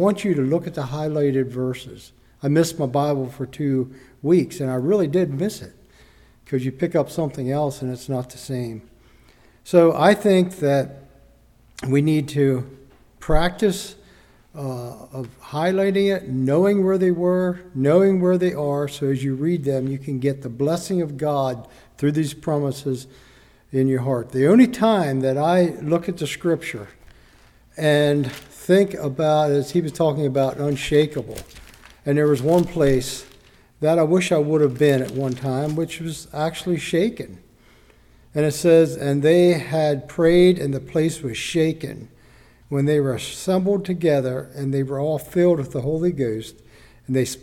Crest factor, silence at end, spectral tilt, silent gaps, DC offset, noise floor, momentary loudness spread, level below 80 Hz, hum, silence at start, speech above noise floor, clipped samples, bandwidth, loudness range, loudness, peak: 18 dB; 0.05 s; -6.5 dB/octave; none; under 0.1%; -53 dBFS; 14 LU; -44 dBFS; none; 0 s; 33 dB; under 0.1%; 16.5 kHz; 5 LU; -21 LUFS; -2 dBFS